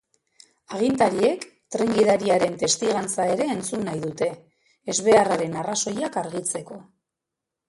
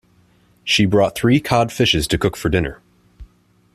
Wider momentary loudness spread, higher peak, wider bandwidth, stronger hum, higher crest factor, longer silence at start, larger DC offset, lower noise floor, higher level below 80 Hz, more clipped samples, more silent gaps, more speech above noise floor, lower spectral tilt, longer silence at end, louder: first, 14 LU vs 6 LU; about the same, -4 dBFS vs -2 dBFS; second, 11.5 kHz vs 14.5 kHz; second, none vs 60 Hz at -40 dBFS; about the same, 20 dB vs 16 dB; about the same, 0.7 s vs 0.65 s; neither; first, -85 dBFS vs -55 dBFS; second, -62 dBFS vs -38 dBFS; neither; neither; first, 63 dB vs 38 dB; second, -3.5 dB/octave vs -5 dB/octave; first, 0.85 s vs 0.5 s; second, -23 LUFS vs -17 LUFS